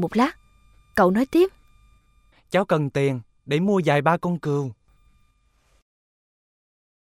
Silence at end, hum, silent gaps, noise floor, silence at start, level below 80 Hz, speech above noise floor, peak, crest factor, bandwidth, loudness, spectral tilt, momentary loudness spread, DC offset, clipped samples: 2.4 s; none; none; -63 dBFS; 0 s; -56 dBFS; 42 dB; -4 dBFS; 20 dB; 16 kHz; -22 LUFS; -7 dB/octave; 8 LU; under 0.1%; under 0.1%